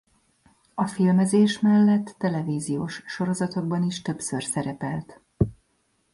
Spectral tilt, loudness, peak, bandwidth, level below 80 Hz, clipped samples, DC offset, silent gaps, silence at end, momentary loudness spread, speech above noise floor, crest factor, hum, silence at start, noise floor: -6 dB/octave; -24 LUFS; -6 dBFS; 11.5 kHz; -52 dBFS; under 0.1%; under 0.1%; none; 0.6 s; 11 LU; 46 dB; 18 dB; none; 0.75 s; -69 dBFS